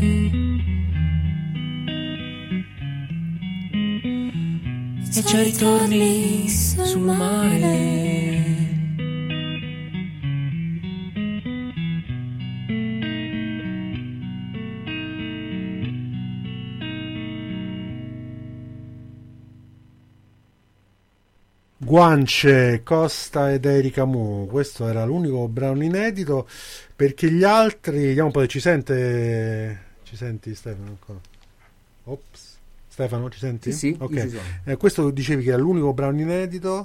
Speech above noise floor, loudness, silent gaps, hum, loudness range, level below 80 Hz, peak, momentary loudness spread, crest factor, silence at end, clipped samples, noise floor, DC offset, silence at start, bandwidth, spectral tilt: 40 dB; -22 LUFS; none; none; 14 LU; -40 dBFS; -4 dBFS; 15 LU; 18 dB; 0 s; under 0.1%; -60 dBFS; under 0.1%; 0 s; 16.5 kHz; -5.5 dB/octave